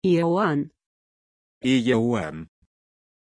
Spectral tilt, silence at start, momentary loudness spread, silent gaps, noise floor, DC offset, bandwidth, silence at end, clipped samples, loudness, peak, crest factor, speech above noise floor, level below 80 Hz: -6.5 dB/octave; 0.05 s; 14 LU; 0.86-1.61 s; under -90 dBFS; under 0.1%; 10.5 kHz; 0.9 s; under 0.1%; -23 LUFS; -8 dBFS; 16 dB; over 68 dB; -58 dBFS